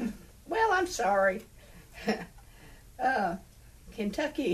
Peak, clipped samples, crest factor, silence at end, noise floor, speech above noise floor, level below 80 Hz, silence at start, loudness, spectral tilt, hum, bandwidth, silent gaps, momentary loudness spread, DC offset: -14 dBFS; under 0.1%; 18 dB; 0 s; -52 dBFS; 22 dB; -54 dBFS; 0 s; -30 LUFS; -4.5 dB/octave; none; 15 kHz; none; 20 LU; under 0.1%